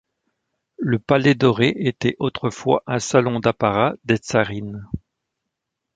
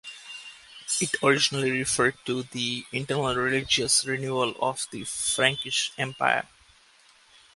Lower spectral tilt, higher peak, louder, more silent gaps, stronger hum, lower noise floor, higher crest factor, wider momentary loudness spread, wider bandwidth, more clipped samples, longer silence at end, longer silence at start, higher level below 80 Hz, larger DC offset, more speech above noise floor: first, -6 dB/octave vs -2.5 dB/octave; about the same, -2 dBFS vs -4 dBFS; first, -20 LUFS vs -25 LUFS; neither; neither; first, -81 dBFS vs -58 dBFS; second, 18 dB vs 24 dB; about the same, 13 LU vs 15 LU; second, 9.4 kHz vs 11.5 kHz; neither; about the same, 1 s vs 1.1 s; first, 0.8 s vs 0.05 s; first, -50 dBFS vs -60 dBFS; neither; first, 61 dB vs 32 dB